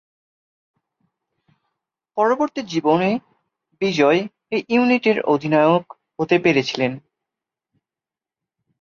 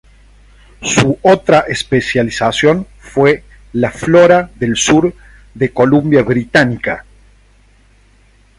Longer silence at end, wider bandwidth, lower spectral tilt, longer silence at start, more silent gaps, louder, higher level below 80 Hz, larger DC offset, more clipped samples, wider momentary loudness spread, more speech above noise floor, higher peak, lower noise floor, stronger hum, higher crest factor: first, 1.85 s vs 1.6 s; second, 7.2 kHz vs 11.5 kHz; about the same, -6 dB/octave vs -5 dB/octave; first, 2.15 s vs 0.8 s; neither; second, -19 LUFS vs -12 LUFS; second, -64 dBFS vs -40 dBFS; neither; neither; about the same, 10 LU vs 10 LU; first, 72 dB vs 37 dB; second, -4 dBFS vs 0 dBFS; first, -90 dBFS vs -48 dBFS; second, none vs 50 Hz at -40 dBFS; about the same, 18 dB vs 14 dB